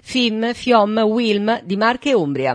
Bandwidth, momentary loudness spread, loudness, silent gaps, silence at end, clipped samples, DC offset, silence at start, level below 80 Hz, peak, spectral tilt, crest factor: 10.5 kHz; 4 LU; -17 LUFS; none; 0 s; under 0.1%; under 0.1%; 0.05 s; -56 dBFS; -2 dBFS; -5 dB/octave; 16 dB